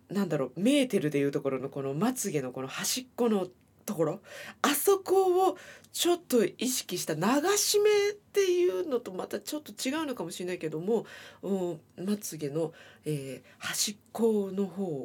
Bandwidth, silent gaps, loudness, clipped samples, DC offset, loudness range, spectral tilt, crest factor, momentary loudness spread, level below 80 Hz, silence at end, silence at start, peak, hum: 19 kHz; none; -29 LUFS; under 0.1%; under 0.1%; 7 LU; -4 dB/octave; 20 dB; 12 LU; -76 dBFS; 0 s; 0.1 s; -10 dBFS; none